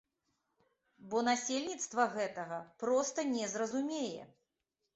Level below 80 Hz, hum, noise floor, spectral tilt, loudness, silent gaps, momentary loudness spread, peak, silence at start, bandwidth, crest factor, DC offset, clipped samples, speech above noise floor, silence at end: -80 dBFS; none; -87 dBFS; -2.5 dB/octave; -36 LUFS; none; 9 LU; -16 dBFS; 1 s; 8 kHz; 22 dB; under 0.1%; under 0.1%; 51 dB; 0.7 s